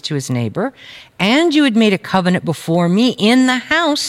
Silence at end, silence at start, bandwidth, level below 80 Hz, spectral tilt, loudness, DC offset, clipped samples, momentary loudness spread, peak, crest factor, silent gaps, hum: 0 s; 0.05 s; 15.5 kHz; -56 dBFS; -5 dB/octave; -15 LUFS; under 0.1%; under 0.1%; 8 LU; -2 dBFS; 14 dB; none; none